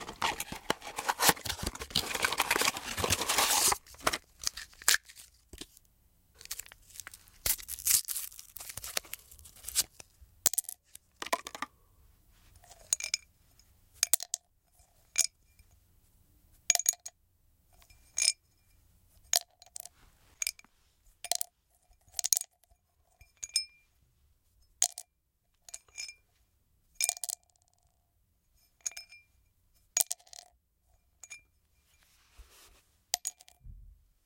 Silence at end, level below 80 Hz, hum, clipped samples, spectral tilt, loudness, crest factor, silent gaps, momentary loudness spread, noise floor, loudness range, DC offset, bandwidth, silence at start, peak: 0.35 s; -60 dBFS; none; under 0.1%; 0 dB/octave; -31 LUFS; 36 dB; none; 22 LU; -77 dBFS; 10 LU; under 0.1%; 17 kHz; 0 s; -2 dBFS